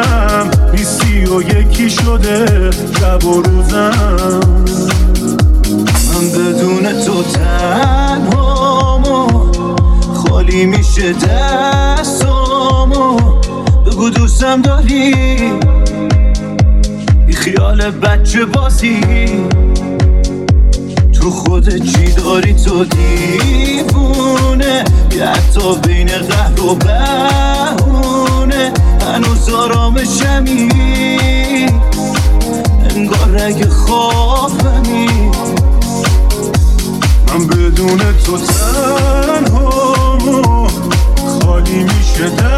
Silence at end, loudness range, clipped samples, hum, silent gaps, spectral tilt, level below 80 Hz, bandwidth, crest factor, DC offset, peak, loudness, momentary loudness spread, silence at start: 0 s; 1 LU; under 0.1%; none; none; -5.5 dB/octave; -12 dBFS; 14.5 kHz; 8 dB; under 0.1%; 0 dBFS; -11 LUFS; 2 LU; 0 s